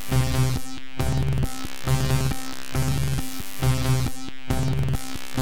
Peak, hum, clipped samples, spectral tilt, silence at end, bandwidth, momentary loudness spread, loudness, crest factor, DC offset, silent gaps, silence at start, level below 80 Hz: -10 dBFS; none; under 0.1%; -5.5 dB/octave; 0 s; over 20 kHz; 9 LU; -26 LUFS; 16 dB; 5%; none; 0 s; -32 dBFS